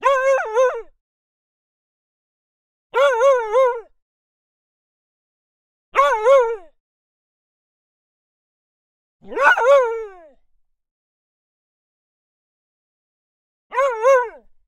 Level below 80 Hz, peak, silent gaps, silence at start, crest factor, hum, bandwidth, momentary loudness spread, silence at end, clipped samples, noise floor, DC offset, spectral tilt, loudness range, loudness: -60 dBFS; 0 dBFS; 1.01-2.90 s, 4.02-5.92 s, 6.80-9.19 s, 10.91-13.70 s; 0 s; 22 dB; none; 10.5 kHz; 16 LU; 0.4 s; under 0.1%; -62 dBFS; under 0.1%; -0.5 dB/octave; 3 LU; -17 LUFS